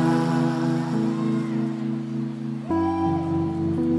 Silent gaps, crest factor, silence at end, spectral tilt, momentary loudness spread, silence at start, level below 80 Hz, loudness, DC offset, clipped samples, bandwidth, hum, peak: none; 14 dB; 0 s; -8 dB/octave; 6 LU; 0 s; -58 dBFS; -25 LUFS; under 0.1%; under 0.1%; 11 kHz; none; -10 dBFS